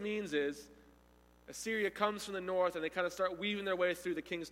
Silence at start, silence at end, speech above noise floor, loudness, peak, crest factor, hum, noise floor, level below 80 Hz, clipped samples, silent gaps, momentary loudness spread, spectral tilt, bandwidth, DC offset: 0 s; 0 s; 28 dB; -36 LUFS; -18 dBFS; 20 dB; 60 Hz at -70 dBFS; -65 dBFS; -68 dBFS; under 0.1%; none; 6 LU; -4 dB/octave; 16.5 kHz; under 0.1%